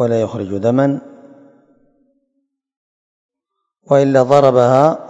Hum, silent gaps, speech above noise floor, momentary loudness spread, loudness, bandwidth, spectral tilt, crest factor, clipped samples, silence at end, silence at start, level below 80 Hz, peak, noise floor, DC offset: none; 2.77-3.29 s; 63 dB; 8 LU; -13 LUFS; 8.2 kHz; -7.5 dB/octave; 16 dB; 0.2%; 0 s; 0 s; -62 dBFS; 0 dBFS; -76 dBFS; under 0.1%